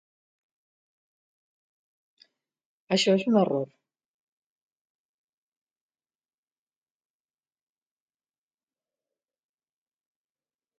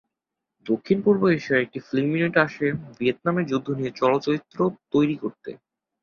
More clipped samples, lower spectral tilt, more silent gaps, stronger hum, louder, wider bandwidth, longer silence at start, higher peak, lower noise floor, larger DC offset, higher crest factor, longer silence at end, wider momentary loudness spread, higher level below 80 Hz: neither; second, -4.5 dB/octave vs -7.5 dB/octave; neither; neither; about the same, -24 LUFS vs -23 LUFS; about the same, 7.4 kHz vs 7 kHz; first, 2.9 s vs 0.65 s; second, -10 dBFS vs -4 dBFS; first, under -90 dBFS vs -85 dBFS; neither; about the same, 24 dB vs 20 dB; first, 7.15 s vs 0.45 s; about the same, 9 LU vs 8 LU; second, -82 dBFS vs -62 dBFS